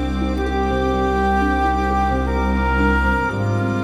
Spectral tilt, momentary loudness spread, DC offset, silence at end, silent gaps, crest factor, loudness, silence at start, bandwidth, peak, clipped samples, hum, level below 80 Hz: -7.5 dB/octave; 4 LU; under 0.1%; 0 s; none; 12 dB; -19 LUFS; 0 s; 11 kHz; -6 dBFS; under 0.1%; none; -24 dBFS